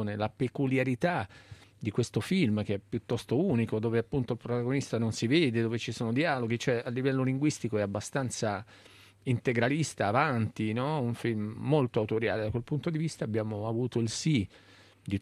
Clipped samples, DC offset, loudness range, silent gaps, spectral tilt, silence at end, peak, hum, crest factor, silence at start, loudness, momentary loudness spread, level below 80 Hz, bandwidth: under 0.1%; under 0.1%; 2 LU; none; -6 dB/octave; 0 s; -12 dBFS; none; 18 dB; 0 s; -30 LUFS; 6 LU; -64 dBFS; 13 kHz